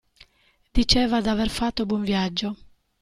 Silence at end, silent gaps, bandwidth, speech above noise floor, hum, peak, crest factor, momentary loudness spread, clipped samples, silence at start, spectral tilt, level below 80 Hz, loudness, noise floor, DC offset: 0.45 s; none; 13 kHz; 41 dB; none; -4 dBFS; 20 dB; 9 LU; under 0.1%; 0.75 s; -4.5 dB/octave; -36 dBFS; -23 LUFS; -63 dBFS; under 0.1%